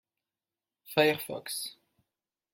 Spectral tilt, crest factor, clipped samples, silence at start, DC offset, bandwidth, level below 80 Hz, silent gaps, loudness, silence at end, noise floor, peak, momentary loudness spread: -3.5 dB/octave; 24 dB; under 0.1%; 0.85 s; under 0.1%; 17 kHz; -76 dBFS; none; -30 LUFS; 0.8 s; under -90 dBFS; -10 dBFS; 10 LU